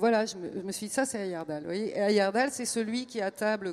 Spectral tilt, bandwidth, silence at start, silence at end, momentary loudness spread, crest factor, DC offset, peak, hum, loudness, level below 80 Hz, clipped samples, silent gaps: -4 dB/octave; 15 kHz; 0 s; 0 s; 10 LU; 18 dB; under 0.1%; -12 dBFS; none; -30 LUFS; -74 dBFS; under 0.1%; none